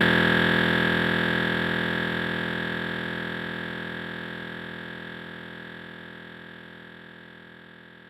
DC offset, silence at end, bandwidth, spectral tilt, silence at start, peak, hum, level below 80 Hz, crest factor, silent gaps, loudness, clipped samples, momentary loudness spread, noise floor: under 0.1%; 0 s; 16 kHz; -6 dB/octave; 0 s; -8 dBFS; none; -52 dBFS; 20 dB; none; -26 LUFS; under 0.1%; 23 LU; -48 dBFS